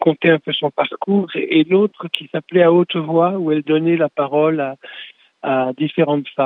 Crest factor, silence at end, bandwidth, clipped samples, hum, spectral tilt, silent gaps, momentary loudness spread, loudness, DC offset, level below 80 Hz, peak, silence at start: 16 dB; 0 s; 4.2 kHz; under 0.1%; none; -8.5 dB/octave; none; 9 LU; -17 LUFS; under 0.1%; -70 dBFS; 0 dBFS; 0 s